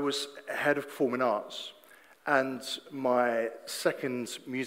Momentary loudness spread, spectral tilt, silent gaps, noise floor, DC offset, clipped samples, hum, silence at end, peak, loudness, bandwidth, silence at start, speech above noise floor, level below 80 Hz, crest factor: 10 LU; -3.5 dB/octave; none; -57 dBFS; under 0.1%; under 0.1%; none; 0 s; -10 dBFS; -31 LUFS; 16 kHz; 0 s; 26 dB; -82 dBFS; 20 dB